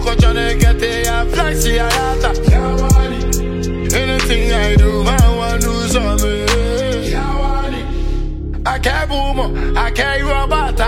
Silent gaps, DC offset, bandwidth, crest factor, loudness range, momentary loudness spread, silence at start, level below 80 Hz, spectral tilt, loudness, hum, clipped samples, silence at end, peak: none; under 0.1%; 16.5 kHz; 14 dB; 4 LU; 7 LU; 0 s; -16 dBFS; -4.5 dB/octave; -16 LUFS; none; under 0.1%; 0 s; 0 dBFS